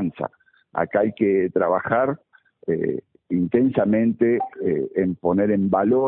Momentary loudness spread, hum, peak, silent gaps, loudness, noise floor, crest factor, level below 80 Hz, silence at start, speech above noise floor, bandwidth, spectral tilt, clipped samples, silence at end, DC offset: 11 LU; none; -6 dBFS; none; -22 LUFS; -47 dBFS; 16 dB; -58 dBFS; 0 s; 27 dB; 3.9 kHz; -13 dB/octave; under 0.1%; 0 s; under 0.1%